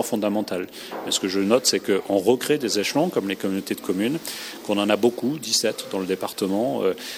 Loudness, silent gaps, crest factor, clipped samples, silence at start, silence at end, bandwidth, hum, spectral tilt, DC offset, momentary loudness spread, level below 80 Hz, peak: -23 LUFS; none; 20 dB; under 0.1%; 0 s; 0 s; 19 kHz; none; -3.5 dB/octave; under 0.1%; 9 LU; -68 dBFS; -4 dBFS